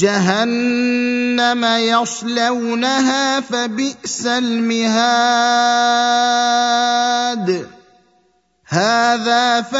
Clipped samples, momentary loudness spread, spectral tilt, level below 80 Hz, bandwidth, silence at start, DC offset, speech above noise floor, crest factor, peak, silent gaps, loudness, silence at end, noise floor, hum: under 0.1%; 6 LU; -3 dB/octave; -66 dBFS; 8 kHz; 0 s; under 0.1%; 44 dB; 16 dB; 0 dBFS; none; -16 LUFS; 0 s; -59 dBFS; none